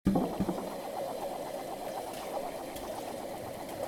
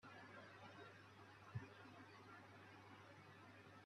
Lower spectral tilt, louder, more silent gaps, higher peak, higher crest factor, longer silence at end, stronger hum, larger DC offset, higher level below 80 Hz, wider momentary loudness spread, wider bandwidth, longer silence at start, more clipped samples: about the same, -6 dB/octave vs -6 dB/octave; first, -37 LUFS vs -61 LUFS; neither; first, -14 dBFS vs -40 dBFS; about the same, 22 dB vs 22 dB; about the same, 0 s vs 0 s; neither; neither; first, -54 dBFS vs -88 dBFS; about the same, 7 LU vs 7 LU; first, 19.5 kHz vs 12 kHz; about the same, 0.05 s vs 0 s; neither